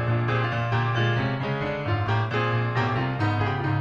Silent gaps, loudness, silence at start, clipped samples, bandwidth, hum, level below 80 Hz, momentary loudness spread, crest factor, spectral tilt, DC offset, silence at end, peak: none; -25 LUFS; 0 s; under 0.1%; 6.6 kHz; none; -50 dBFS; 3 LU; 12 dB; -7.5 dB/octave; under 0.1%; 0 s; -12 dBFS